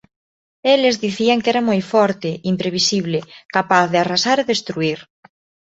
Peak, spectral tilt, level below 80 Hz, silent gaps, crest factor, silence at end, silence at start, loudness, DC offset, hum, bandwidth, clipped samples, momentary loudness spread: -2 dBFS; -4 dB/octave; -60 dBFS; 3.45-3.49 s; 16 dB; 0.65 s; 0.65 s; -17 LUFS; under 0.1%; none; 8 kHz; under 0.1%; 8 LU